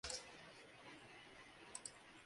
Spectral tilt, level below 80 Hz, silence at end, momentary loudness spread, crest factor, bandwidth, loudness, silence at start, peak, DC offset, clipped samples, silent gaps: -1 dB/octave; -74 dBFS; 0 s; 10 LU; 24 dB; 11.5 kHz; -55 LUFS; 0.05 s; -32 dBFS; under 0.1%; under 0.1%; none